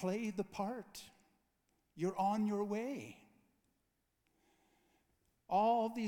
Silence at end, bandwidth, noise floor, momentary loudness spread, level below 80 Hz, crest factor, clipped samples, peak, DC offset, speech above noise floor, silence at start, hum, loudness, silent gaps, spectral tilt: 0 s; 18.5 kHz; -83 dBFS; 16 LU; -78 dBFS; 18 dB; under 0.1%; -22 dBFS; under 0.1%; 45 dB; 0 s; none; -38 LUFS; none; -6.5 dB/octave